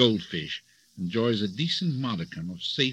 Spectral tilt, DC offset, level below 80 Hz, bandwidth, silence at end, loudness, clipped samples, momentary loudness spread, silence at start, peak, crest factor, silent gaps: -5.5 dB/octave; under 0.1%; -64 dBFS; 10.5 kHz; 0 s; -29 LUFS; under 0.1%; 10 LU; 0 s; -4 dBFS; 24 dB; none